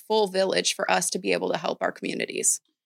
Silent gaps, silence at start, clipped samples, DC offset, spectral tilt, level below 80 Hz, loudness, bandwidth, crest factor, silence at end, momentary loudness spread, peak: none; 0.1 s; under 0.1%; under 0.1%; -2 dB/octave; -80 dBFS; -25 LUFS; 16.5 kHz; 20 dB; 0.3 s; 6 LU; -6 dBFS